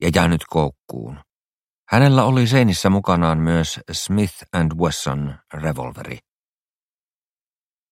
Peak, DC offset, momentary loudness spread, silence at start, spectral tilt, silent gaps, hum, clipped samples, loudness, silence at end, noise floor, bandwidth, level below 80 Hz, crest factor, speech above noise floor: 0 dBFS; under 0.1%; 18 LU; 0 s; -6 dB/octave; 1.32-1.85 s; none; under 0.1%; -19 LUFS; 1.75 s; under -90 dBFS; 16 kHz; -40 dBFS; 20 dB; over 72 dB